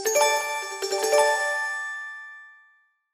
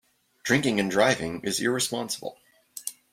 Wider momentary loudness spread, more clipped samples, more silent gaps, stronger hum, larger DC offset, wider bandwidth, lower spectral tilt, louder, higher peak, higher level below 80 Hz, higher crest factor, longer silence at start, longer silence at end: first, 18 LU vs 14 LU; neither; neither; neither; neither; about the same, 16 kHz vs 16.5 kHz; second, 1.5 dB/octave vs -3.5 dB/octave; about the same, -24 LUFS vs -26 LUFS; about the same, -6 dBFS vs -8 dBFS; second, -82 dBFS vs -62 dBFS; about the same, 20 dB vs 20 dB; second, 0 s vs 0.45 s; first, 0.65 s vs 0.2 s